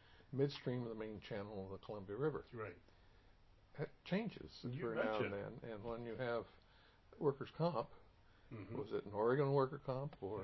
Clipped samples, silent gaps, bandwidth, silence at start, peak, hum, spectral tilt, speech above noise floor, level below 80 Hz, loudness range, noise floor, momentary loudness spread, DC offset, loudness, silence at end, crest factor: under 0.1%; none; 5.8 kHz; 0.05 s; -24 dBFS; none; -6 dB/octave; 25 dB; -70 dBFS; 6 LU; -67 dBFS; 12 LU; under 0.1%; -43 LUFS; 0 s; 20 dB